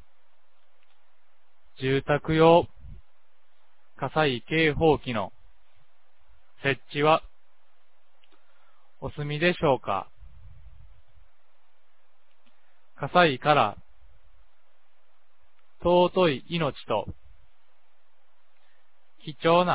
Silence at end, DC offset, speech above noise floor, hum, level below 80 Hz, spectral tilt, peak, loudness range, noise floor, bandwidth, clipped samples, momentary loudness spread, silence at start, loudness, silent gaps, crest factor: 0 s; 0.8%; 47 dB; none; -52 dBFS; -9.5 dB/octave; -6 dBFS; 5 LU; -70 dBFS; 4 kHz; under 0.1%; 18 LU; 1.8 s; -24 LUFS; none; 22 dB